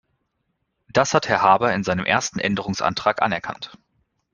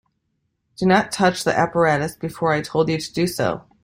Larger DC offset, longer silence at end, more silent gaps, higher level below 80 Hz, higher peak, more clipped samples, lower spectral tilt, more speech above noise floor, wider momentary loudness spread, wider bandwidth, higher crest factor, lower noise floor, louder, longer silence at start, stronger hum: neither; first, 0.65 s vs 0.25 s; neither; about the same, -56 dBFS vs -54 dBFS; about the same, -2 dBFS vs -2 dBFS; neither; about the same, -4 dB/octave vs -5 dB/octave; about the same, 53 dB vs 52 dB; first, 11 LU vs 6 LU; second, 10 kHz vs 16 kHz; about the same, 20 dB vs 20 dB; about the same, -74 dBFS vs -72 dBFS; about the same, -20 LUFS vs -20 LUFS; first, 0.95 s vs 0.8 s; neither